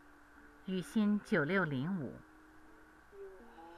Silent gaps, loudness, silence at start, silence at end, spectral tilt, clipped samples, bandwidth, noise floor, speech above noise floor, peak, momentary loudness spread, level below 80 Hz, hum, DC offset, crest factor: none; -35 LUFS; 0.4 s; 0 s; -7 dB/octave; under 0.1%; 13.5 kHz; -60 dBFS; 25 dB; -20 dBFS; 21 LU; -68 dBFS; none; under 0.1%; 18 dB